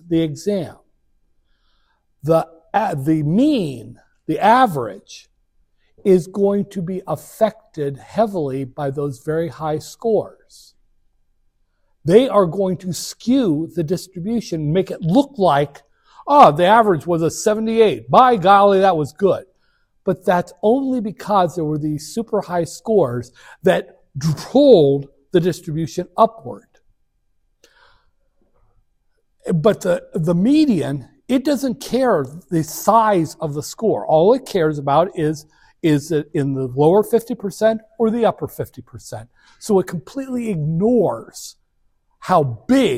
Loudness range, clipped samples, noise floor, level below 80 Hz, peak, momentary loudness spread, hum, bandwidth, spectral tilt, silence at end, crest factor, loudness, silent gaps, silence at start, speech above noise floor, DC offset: 7 LU; under 0.1%; -64 dBFS; -52 dBFS; 0 dBFS; 14 LU; none; 16 kHz; -6.5 dB/octave; 0 s; 18 dB; -18 LUFS; none; 0.05 s; 47 dB; under 0.1%